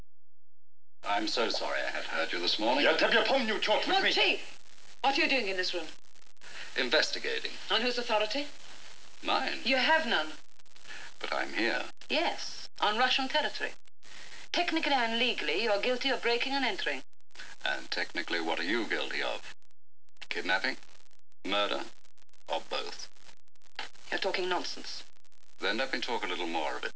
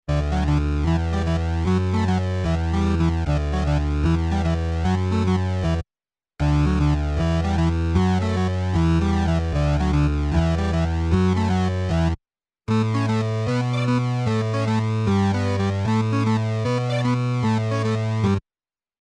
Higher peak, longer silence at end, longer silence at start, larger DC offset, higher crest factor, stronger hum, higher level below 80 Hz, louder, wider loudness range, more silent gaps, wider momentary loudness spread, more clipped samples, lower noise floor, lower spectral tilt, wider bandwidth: second, -12 dBFS vs -8 dBFS; second, 0.05 s vs 0.6 s; first, 1.05 s vs 0.1 s; first, 2% vs under 0.1%; first, 20 dB vs 14 dB; neither; second, -72 dBFS vs -28 dBFS; second, -30 LUFS vs -22 LUFS; first, 8 LU vs 2 LU; neither; first, 18 LU vs 3 LU; neither; second, -52 dBFS vs under -90 dBFS; second, -2 dB/octave vs -7.5 dB/octave; second, 8 kHz vs 9.6 kHz